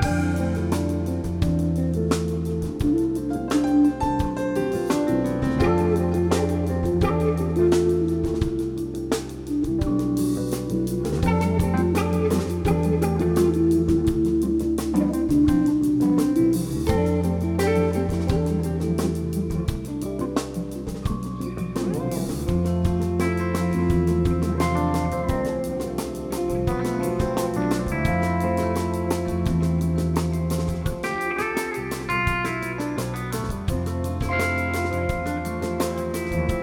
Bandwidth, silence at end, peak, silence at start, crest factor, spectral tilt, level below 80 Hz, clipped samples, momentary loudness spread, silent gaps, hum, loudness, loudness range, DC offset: 18 kHz; 0 s; -6 dBFS; 0 s; 16 dB; -7 dB/octave; -34 dBFS; under 0.1%; 7 LU; none; none; -23 LUFS; 5 LU; under 0.1%